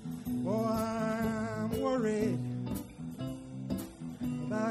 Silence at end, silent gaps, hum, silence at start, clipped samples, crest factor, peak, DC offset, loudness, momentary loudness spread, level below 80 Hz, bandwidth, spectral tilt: 0 s; none; none; 0 s; under 0.1%; 16 dB; -18 dBFS; under 0.1%; -35 LUFS; 10 LU; -56 dBFS; 15.5 kHz; -7 dB/octave